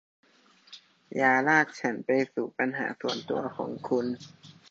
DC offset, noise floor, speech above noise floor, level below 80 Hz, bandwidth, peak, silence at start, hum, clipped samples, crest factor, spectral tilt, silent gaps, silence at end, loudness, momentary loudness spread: under 0.1%; -59 dBFS; 31 dB; -76 dBFS; 7.8 kHz; -8 dBFS; 0.7 s; none; under 0.1%; 22 dB; -5 dB/octave; none; 0.2 s; -28 LUFS; 13 LU